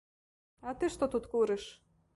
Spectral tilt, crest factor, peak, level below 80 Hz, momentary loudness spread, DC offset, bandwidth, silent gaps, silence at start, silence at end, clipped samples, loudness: -5 dB/octave; 16 dB; -20 dBFS; -60 dBFS; 14 LU; under 0.1%; 11.5 kHz; none; 0.65 s; 0.4 s; under 0.1%; -34 LUFS